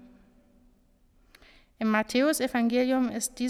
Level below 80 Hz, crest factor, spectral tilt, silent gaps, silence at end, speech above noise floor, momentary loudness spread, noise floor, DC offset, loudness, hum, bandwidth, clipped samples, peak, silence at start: -60 dBFS; 16 dB; -3.5 dB/octave; none; 0 s; 37 dB; 4 LU; -63 dBFS; under 0.1%; -26 LUFS; none; 15.5 kHz; under 0.1%; -12 dBFS; 0.05 s